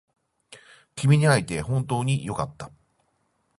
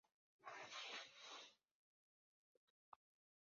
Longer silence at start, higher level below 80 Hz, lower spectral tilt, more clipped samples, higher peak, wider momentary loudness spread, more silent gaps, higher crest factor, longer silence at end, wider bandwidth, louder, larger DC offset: about the same, 0.5 s vs 0.4 s; first, -52 dBFS vs under -90 dBFS; first, -6 dB/octave vs 2.5 dB/octave; neither; first, -4 dBFS vs -40 dBFS; first, 23 LU vs 11 LU; second, none vs 1.71-2.92 s; about the same, 20 dB vs 20 dB; first, 0.9 s vs 0.45 s; first, 11.5 kHz vs 7.4 kHz; first, -24 LUFS vs -56 LUFS; neither